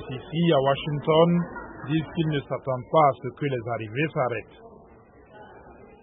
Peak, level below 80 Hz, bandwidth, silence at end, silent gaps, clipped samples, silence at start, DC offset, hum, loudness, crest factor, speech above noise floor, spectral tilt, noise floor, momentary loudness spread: -6 dBFS; -56 dBFS; 3.9 kHz; 0.2 s; none; under 0.1%; 0 s; under 0.1%; none; -25 LUFS; 18 dB; 27 dB; -11.5 dB/octave; -52 dBFS; 10 LU